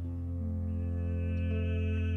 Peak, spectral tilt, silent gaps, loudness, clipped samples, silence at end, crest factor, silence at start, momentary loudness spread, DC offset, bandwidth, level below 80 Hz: -24 dBFS; -9.5 dB/octave; none; -34 LUFS; under 0.1%; 0 s; 8 dB; 0 s; 4 LU; under 0.1%; 3.4 kHz; -40 dBFS